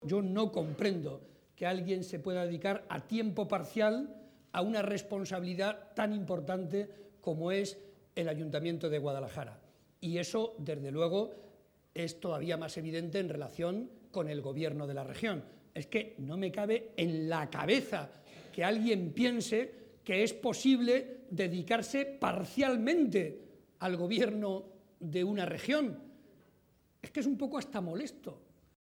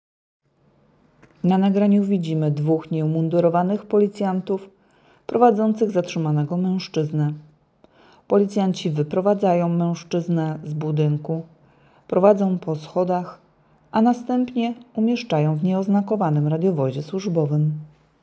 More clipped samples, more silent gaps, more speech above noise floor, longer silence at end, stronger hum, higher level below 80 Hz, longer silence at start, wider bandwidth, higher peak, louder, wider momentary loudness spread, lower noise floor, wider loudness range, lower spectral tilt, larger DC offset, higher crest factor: neither; neither; second, 35 dB vs 40 dB; about the same, 0.45 s vs 0.35 s; neither; second, -74 dBFS vs -66 dBFS; second, 0 s vs 1.45 s; first, 18 kHz vs 8 kHz; second, -16 dBFS vs -2 dBFS; second, -35 LUFS vs -21 LUFS; first, 12 LU vs 8 LU; first, -69 dBFS vs -60 dBFS; first, 6 LU vs 2 LU; second, -5.5 dB/octave vs -8.5 dB/octave; neither; about the same, 20 dB vs 20 dB